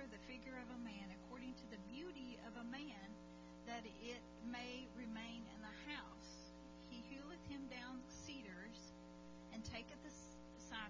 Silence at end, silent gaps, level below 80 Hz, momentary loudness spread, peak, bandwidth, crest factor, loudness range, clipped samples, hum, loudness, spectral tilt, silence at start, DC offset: 0 s; none; -68 dBFS; 7 LU; -36 dBFS; 7.6 kHz; 18 dB; 2 LU; under 0.1%; 60 Hz at -65 dBFS; -54 LUFS; -4.5 dB/octave; 0 s; under 0.1%